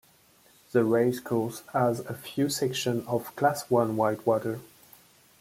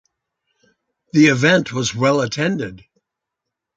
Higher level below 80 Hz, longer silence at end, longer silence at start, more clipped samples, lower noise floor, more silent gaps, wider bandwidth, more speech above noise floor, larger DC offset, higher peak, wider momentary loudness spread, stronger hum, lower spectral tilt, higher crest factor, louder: second, -68 dBFS vs -56 dBFS; second, 0.75 s vs 1 s; second, 0.75 s vs 1.15 s; neither; second, -60 dBFS vs -82 dBFS; neither; first, 16.5 kHz vs 9.2 kHz; second, 33 dB vs 65 dB; neither; second, -10 dBFS vs -2 dBFS; about the same, 8 LU vs 10 LU; neither; about the same, -5.5 dB/octave vs -5 dB/octave; about the same, 18 dB vs 18 dB; second, -28 LUFS vs -17 LUFS